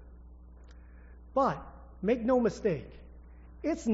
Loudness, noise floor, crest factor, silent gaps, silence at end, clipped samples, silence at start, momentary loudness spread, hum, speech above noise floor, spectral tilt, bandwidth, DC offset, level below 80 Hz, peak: -31 LUFS; -51 dBFS; 18 dB; none; 0 s; under 0.1%; 0 s; 21 LU; none; 22 dB; -6.5 dB/octave; 7.6 kHz; under 0.1%; -50 dBFS; -16 dBFS